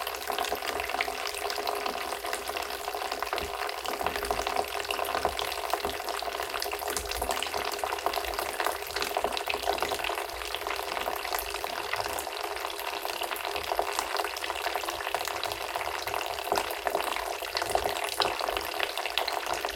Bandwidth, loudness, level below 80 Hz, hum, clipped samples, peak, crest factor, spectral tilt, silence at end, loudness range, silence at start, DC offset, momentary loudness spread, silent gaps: 17 kHz; -31 LUFS; -52 dBFS; none; under 0.1%; -6 dBFS; 26 dB; -1.5 dB/octave; 0 s; 2 LU; 0 s; under 0.1%; 4 LU; none